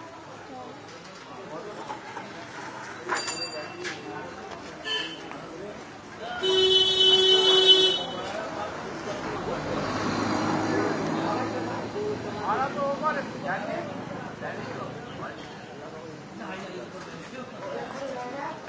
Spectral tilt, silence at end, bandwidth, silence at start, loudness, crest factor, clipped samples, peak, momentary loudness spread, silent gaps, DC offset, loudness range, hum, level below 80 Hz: -3.5 dB/octave; 0 s; 8 kHz; 0 s; -25 LUFS; 22 dB; under 0.1%; -6 dBFS; 23 LU; none; under 0.1%; 17 LU; none; -58 dBFS